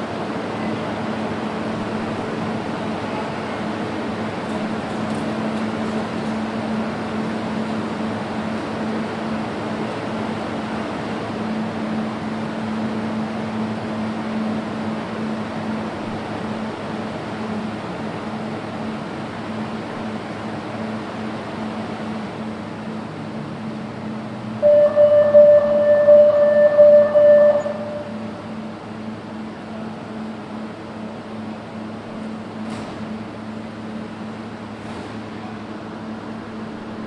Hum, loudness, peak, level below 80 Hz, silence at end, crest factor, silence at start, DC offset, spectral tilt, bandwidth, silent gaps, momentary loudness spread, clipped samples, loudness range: none; -22 LUFS; -2 dBFS; -56 dBFS; 0 s; 18 dB; 0 s; under 0.1%; -7 dB/octave; 10.5 kHz; none; 18 LU; under 0.1%; 17 LU